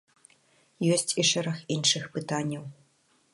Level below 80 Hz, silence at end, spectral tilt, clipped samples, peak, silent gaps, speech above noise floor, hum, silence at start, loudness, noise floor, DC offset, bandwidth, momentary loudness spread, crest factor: -74 dBFS; 0.6 s; -3 dB/octave; under 0.1%; -8 dBFS; none; 39 dB; none; 0.8 s; -27 LUFS; -67 dBFS; under 0.1%; 12 kHz; 10 LU; 22 dB